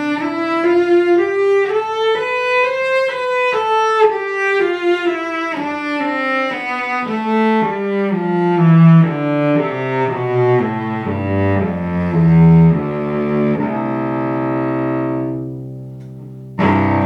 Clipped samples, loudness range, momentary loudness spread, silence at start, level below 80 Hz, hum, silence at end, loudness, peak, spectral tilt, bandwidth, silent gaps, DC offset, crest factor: under 0.1%; 4 LU; 9 LU; 0 s; -50 dBFS; none; 0 s; -16 LUFS; 0 dBFS; -8 dB/octave; 6.6 kHz; none; under 0.1%; 14 dB